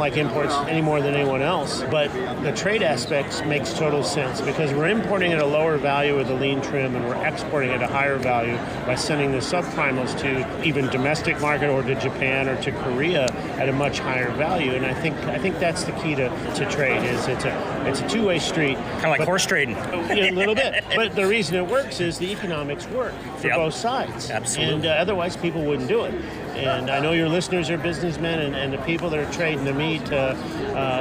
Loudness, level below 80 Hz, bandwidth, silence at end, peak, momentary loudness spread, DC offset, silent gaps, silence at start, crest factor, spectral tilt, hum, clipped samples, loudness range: -23 LUFS; -46 dBFS; 15.5 kHz; 0 s; -8 dBFS; 5 LU; under 0.1%; none; 0 s; 16 dB; -4.5 dB/octave; none; under 0.1%; 3 LU